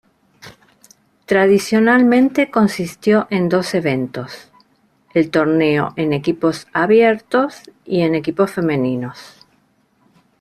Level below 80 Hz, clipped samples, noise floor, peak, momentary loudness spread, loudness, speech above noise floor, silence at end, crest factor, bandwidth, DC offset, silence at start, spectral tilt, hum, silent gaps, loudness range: -56 dBFS; under 0.1%; -59 dBFS; -2 dBFS; 10 LU; -16 LUFS; 43 dB; 1.15 s; 14 dB; 14 kHz; under 0.1%; 0.45 s; -6.5 dB/octave; none; none; 4 LU